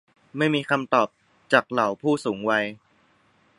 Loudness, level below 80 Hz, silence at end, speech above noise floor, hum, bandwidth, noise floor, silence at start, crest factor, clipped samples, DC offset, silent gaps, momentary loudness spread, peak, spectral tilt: -23 LUFS; -70 dBFS; 0.85 s; 39 dB; none; 11.5 kHz; -62 dBFS; 0.35 s; 22 dB; under 0.1%; under 0.1%; none; 6 LU; -2 dBFS; -5.5 dB/octave